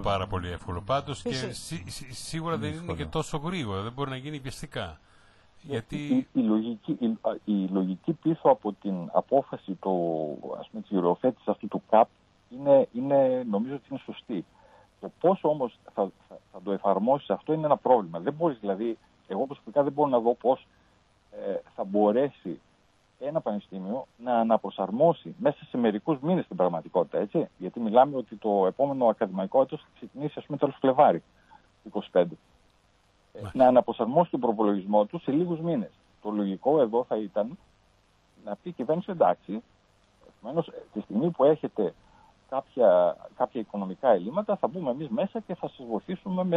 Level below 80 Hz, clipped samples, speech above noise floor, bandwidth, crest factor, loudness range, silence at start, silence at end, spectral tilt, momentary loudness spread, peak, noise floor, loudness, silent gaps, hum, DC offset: -58 dBFS; under 0.1%; 38 dB; 12 kHz; 22 dB; 6 LU; 0 s; 0 s; -7 dB/octave; 14 LU; -6 dBFS; -65 dBFS; -27 LUFS; none; none; under 0.1%